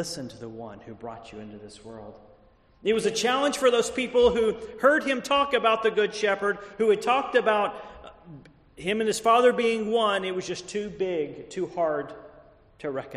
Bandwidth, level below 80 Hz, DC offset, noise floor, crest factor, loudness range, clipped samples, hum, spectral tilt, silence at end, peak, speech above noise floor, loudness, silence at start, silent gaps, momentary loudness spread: 13 kHz; -56 dBFS; under 0.1%; -57 dBFS; 18 dB; 6 LU; under 0.1%; none; -3.5 dB/octave; 0 s; -8 dBFS; 32 dB; -25 LUFS; 0 s; none; 20 LU